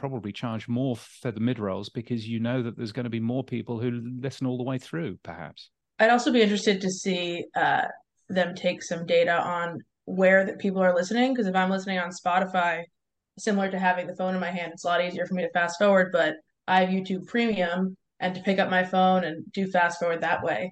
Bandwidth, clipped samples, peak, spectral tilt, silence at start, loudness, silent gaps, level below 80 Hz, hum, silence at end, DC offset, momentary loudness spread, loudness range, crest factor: 9.6 kHz; under 0.1%; -8 dBFS; -5.5 dB/octave; 0 s; -26 LUFS; none; -70 dBFS; none; 0 s; under 0.1%; 11 LU; 6 LU; 18 dB